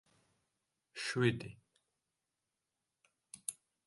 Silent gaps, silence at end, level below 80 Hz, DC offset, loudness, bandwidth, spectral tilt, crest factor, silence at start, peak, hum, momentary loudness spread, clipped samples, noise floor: none; 0.35 s; -74 dBFS; under 0.1%; -38 LUFS; 11.5 kHz; -4.5 dB/octave; 26 dB; 0.95 s; -18 dBFS; none; 19 LU; under 0.1%; -89 dBFS